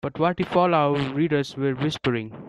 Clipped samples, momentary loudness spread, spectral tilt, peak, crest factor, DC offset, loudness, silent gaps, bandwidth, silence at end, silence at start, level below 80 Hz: under 0.1%; 6 LU; -7 dB/octave; -6 dBFS; 16 dB; under 0.1%; -23 LUFS; none; 11.5 kHz; 0 s; 0.05 s; -56 dBFS